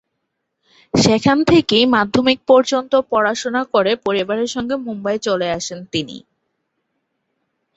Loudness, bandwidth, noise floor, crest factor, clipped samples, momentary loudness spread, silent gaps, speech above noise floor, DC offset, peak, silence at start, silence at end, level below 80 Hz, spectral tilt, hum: -17 LUFS; 8.2 kHz; -74 dBFS; 16 dB; under 0.1%; 10 LU; none; 58 dB; under 0.1%; -2 dBFS; 0.95 s; 1.55 s; -50 dBFS; -4.5 dB/octave; none